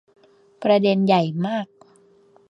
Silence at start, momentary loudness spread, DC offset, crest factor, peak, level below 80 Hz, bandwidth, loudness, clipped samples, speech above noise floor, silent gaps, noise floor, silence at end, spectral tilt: 0.6 s; 11 LU; under 0.1%; 18 dB; -4 dBFS; -70 dBFS; 7.4 kHz; -20 LUFS; under 0.1%; 36 dB; none; -55 dBFS; 0.85 s; -8 dB/octave